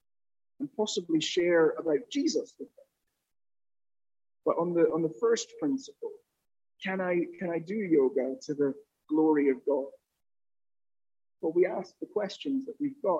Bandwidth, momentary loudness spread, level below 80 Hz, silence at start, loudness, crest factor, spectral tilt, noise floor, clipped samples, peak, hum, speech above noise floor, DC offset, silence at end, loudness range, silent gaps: 8.2 kHz; 13 LU; -80 dBFS; 0.6 s; -30 LUFS; 18 dB; -5 dB/octave; under -90 dBFS; under 0.1%; -12 dBFS; none; over 61 dB; under 0.1%; 0 s; 4 LU; none